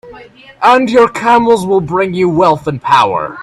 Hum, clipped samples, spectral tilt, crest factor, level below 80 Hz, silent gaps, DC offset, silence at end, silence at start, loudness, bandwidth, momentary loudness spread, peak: none; under 0.1%; -6 dB/octave; 12 dB; -46 dBFS; none; under 0.1%; 0 s; 0.05 s; -11 LUFS; 12.5 kHz; 5 LU; 0 dBFS